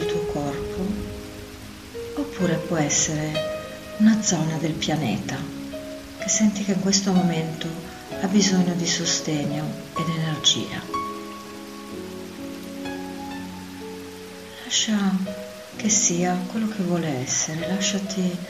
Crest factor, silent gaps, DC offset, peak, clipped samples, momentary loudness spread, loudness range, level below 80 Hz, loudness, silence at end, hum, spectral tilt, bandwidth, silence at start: 20 dB; none; under 0.1%; -6 dBFS; under 0.1%; 17 LU; 6 LU; -50 dBFS; -23 LUFS; 0 s; none; -3.5 dB/octave; 15.5 kHz; 0 s